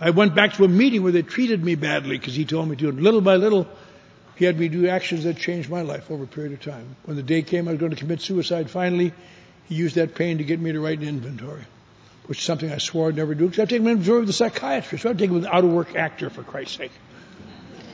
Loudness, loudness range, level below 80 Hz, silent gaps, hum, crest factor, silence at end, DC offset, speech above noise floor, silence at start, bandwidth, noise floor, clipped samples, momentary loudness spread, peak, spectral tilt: -22 LUFS; 6 LU; -62 dBFS; none; none; 22 dB; 0 s; under 0.1%; 29 dB; 0 s; 8 kHz; -50 dBFS; under 0.1%; 16 LU; 0 dBFS; -6 dB/octave